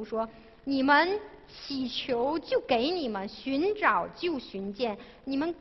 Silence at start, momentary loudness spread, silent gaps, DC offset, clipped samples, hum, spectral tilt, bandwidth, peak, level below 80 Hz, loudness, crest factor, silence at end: 0 s; 14 LU; none; under 0.1%; under 0.1%; none; -5.5 dB/octave; 6 kHz; -10 dBFS; -60 dBFS; -29 LUFS; 20 dB; 0 s